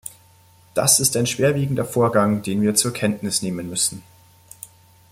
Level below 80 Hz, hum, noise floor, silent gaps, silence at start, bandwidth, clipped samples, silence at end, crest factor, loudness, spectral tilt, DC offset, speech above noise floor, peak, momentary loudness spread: -56 dBFS; none; -52 dBFS; none; 0.05 s; 16.5 kHz; under 0.1%; 0.45 s; 20 dB; -19 LUFS; -4 dB/octave; under 0.1%; 32 dB; -2 dBFS; 24 LU